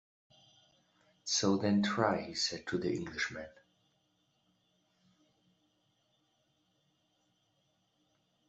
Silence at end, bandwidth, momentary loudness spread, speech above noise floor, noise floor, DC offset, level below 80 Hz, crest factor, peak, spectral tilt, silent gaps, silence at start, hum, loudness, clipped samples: 5 s; 8.2 kHz; 12 LU; 43 dB; -77 dBFS; under 0.1%; -72 dBFS; 24 dB; -14 dBFS; -4 dB/octave; none; 1.25 s; none; -33 LUFS; under 0.1%